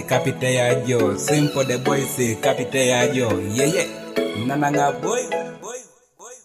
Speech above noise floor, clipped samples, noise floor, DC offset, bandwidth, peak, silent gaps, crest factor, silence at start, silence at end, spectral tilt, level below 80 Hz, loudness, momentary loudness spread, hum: 25 dB; under 0.1%; -45 dBFS; under 0.1%; 15.5 kHz; -6 dBFS; none; 16 dB; 0 s; 0.05 s; -4.5 dB/octave; -60 dBFS; -20 LUFS; 7 LU; none